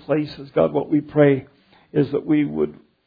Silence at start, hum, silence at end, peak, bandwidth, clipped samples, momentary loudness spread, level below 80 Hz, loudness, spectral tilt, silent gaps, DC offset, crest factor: 0.1 s; none; 0.35 s; -4 dBFS; 5 kHz; under 0.1%; 8 LU; -56 dBFS; -21 LUFS; -10.5 dB/octave; none; under 0.1%; 18 dB